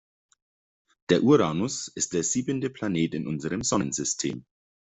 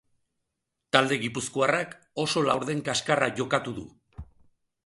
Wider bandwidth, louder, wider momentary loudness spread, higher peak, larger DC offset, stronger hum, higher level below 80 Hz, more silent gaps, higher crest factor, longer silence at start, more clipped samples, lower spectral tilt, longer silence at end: second, 8.2 kHz vs 11.5 kHz; about the same, -26 LUFS vs -26 LUFS; about the same, 10 LU vs 11 LU; second, -6 dBFS vs -2 dBFS; neither; neither; about the same, -60 dBFS vs -58 dBFS; neither; second, 20 dB vs 26 dB; first, 1.1 s vs 0.95 s; neither; about the same, -4.5 dB/octave vs -4 dB/octave; second, 0.45 s vs 0.6 s